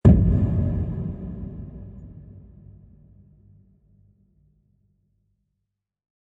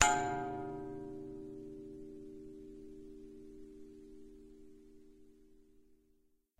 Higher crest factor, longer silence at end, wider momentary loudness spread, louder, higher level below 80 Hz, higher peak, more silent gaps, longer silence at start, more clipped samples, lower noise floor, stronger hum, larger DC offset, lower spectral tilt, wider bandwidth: second, 24 dB vs 36 dB; first, 3.85 s vs 0.65 s; first, 27 LU vs 20 LU; first, -24 LUFS vs -42 LUFS; first, -32 dBFS vs -62 dBFS; first, -2 dBFS vs -6 dBFS; neither; about the same, 0.05 s vs 0 s; neither; first, -81 dBFS vs -73 dBFS; neither; neither; first, -11.5 dB/octave vs -2.5 dB/octave; second, 3.7 kHz vs 15.5 kHz